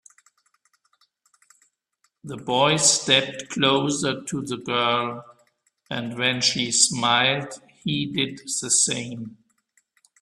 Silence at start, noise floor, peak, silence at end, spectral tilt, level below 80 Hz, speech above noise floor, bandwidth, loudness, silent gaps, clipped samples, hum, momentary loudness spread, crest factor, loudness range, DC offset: 2.25 s; -71 dBFS; -4 dBFS; 0.9 s; -2 dB/octave; -64 dBFS; 48 dB; 13.5 kHz; -21 LUFS; none; under 0.1%; none; 16 LU; 22 dB; 3 LU; under 0.1%